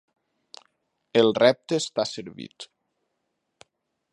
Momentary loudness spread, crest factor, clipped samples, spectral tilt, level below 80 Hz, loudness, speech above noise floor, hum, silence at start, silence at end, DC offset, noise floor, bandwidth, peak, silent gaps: 23 LU; 24 dB; under 0.1%; -4.5 dB/octave; -74 dBFS; -23 LUFS; 55 dB; none; 1.15 s; 1.5 s; under 0.1%; -78 dBFS; 11 kHz; -4 dBFS; none